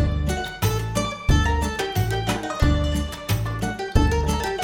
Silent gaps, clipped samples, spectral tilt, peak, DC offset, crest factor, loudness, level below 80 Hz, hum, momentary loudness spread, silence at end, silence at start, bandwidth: none; under 0.1%; -5.5 dB/octave; -4 dBFS; under 0.1%; 18 dB; -23 LUFS; -26 dBFS; none; 5 LU; 0 s; 0 s; 17.5 kHz